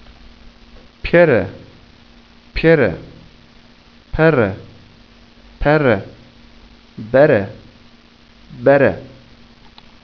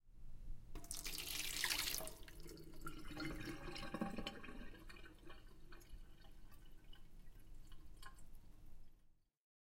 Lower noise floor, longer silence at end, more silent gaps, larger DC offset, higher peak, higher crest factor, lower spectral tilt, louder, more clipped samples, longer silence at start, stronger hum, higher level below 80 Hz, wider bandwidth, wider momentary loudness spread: second, -47 dBFS vs -70 dBFS; first, 0.95 s vs 0.45 s; neither; first, 0.2% vs under 0.1%; first, 0 dBFS vs -22 dBFS; second, 18 dB vs 26 dB; first, -9 dB/octave vs -2 dB/octave; first, -15 LUFS vs -47 LUFS; neither; first, 1.05 s vs 0.05 s; neither; first, -38 dBFS vs -56 dBFS; second, 5.4 kHz vs 17 kHz; second, 18 LU vs 24 LU